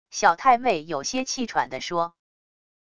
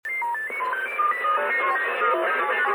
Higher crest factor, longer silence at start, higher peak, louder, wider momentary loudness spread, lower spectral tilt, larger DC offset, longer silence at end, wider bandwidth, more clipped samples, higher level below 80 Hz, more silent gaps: first, 20 dB vs 12 dB; about the same, 0.1 s vs 0.05 s; first, -4 dBFS vs -12 dBFS; about the same, -24 LUFS vs -23 LUFS; first, 8 LU vs 5 LU; about the same, -2.5 dB/octave vs -2 dB/octave; neither; first, 0.75 s vs 0 s; second, 10.5 kHz vs 19 kHz; neither; first, -60 dBFS vs -76 dBFS; neither